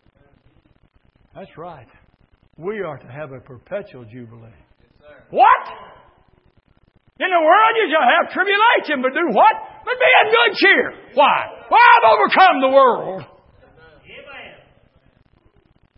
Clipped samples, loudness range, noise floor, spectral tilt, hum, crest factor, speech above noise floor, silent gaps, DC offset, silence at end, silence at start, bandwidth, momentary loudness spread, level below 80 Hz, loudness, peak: under 0.1%; 20 LU; -57 dBFS; -8.5 dB/octave; none; 18 dB; 41 dB; none; under 0.1%; 1.5 s; 1.35 s; 5.8 kHz; 23 LU; -60 dBFS; -14 LUFS; 0 dBFS